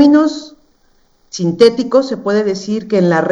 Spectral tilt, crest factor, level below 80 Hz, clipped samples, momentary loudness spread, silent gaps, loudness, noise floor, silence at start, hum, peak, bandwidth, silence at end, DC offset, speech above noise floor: -6 dB/octave; 14 dB; -56 dBFS; 0.1%; 10 LU; none; -14 LUFS; -54 dBFS; 0 s; none; 0 dBFS; 10 kHz; 0 s; under 0.1%; 41 dB